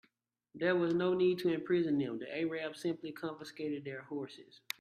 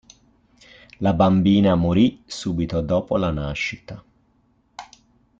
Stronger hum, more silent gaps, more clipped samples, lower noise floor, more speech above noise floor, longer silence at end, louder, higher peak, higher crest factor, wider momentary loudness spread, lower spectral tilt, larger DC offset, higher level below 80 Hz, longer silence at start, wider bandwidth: neither; neither; neither; first, -76 dBFS vs -62 dBFS; about the same, 42 dB vs 43 dB; second, 0.35 s vs 0.55 s; second, -35 LUFS vs -20 LUFS; second, -16 dBFS vs -4 dBFS; about the same, 20 dB vs 18 dB; second, 12 LU vs 24 LU; about the same, -6.5 dB/octave vs -7 dB/octave; neither; second, -78 dBFS vs -44 dBFS; second, 0.55 s vs 1 s; first, 14.5 kHz vs 7.8 kHz